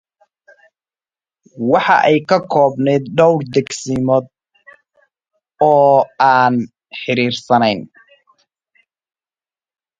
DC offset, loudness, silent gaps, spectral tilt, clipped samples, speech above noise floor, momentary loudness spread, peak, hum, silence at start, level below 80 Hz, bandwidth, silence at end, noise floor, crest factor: under 0.1%; -14 LUFS; none; -5.5 dB/octave; under 0.1%; over 76 dB; 9 LU; 0 dBFS; none; 1.55 s; -58 dBFS; 9.4 kHz; 2.15 s; under -90 dBFS; 16 dB